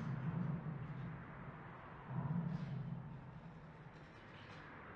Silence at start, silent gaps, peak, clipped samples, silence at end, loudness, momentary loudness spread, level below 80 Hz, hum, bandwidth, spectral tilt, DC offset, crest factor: 0 s; none; -30 dBFS; under 0.1%; 0 s; -47 LUFS; 14 LU; -66 dBFS; none; 6.4 kHz; -9 dB/octave; under 0.1%; 16 dB